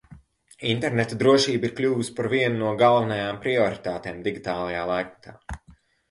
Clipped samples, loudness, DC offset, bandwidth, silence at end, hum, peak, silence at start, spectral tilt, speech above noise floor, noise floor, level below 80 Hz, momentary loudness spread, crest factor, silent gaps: under 0.1%; -24 LUFS; under 0.1%; 11.5 kHz; 0.4 s; none; -6 dBFS; 0.1 s; -5.5 dB/octave; 32 dB; -56 dBFS; -52 dBFS; 16 LU; 20 dB; none